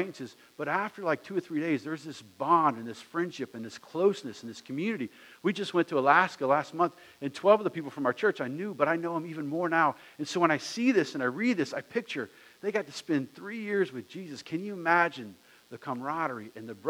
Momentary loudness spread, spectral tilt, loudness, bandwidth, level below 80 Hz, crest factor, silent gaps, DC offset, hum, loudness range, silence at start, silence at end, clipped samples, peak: 16 LU; -5.5 dB/octave; -30 LUFS; 16.5 kHz; -84 dBFS; 22 dB; none; under 0.1%; none; 5 LU; 0 s; 0 s; under 0.1%; -8 dBFS